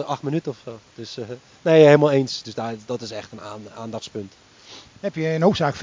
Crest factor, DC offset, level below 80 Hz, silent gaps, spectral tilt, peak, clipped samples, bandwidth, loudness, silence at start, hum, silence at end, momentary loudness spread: 20 dB; under 0.1%; -58 dBFS; none; -6.5 dB/octave; -2 dBFS; under 0.1%; 7.6 kHz; -20 LUFS; 0 s; none; 0 s; 23 LU